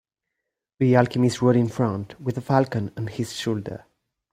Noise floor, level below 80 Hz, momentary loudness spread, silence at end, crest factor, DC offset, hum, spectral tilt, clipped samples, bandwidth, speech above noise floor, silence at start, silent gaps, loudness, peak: -83 dBFS; -58 dBFS; 11 LU; 0.55 s; 22 dB; under 0.1%; none; -7 dB/octave; under 0.1%; 15.5 kHz; 61 dB; 0.8 s; none; -23 LUFS; -2 dBFS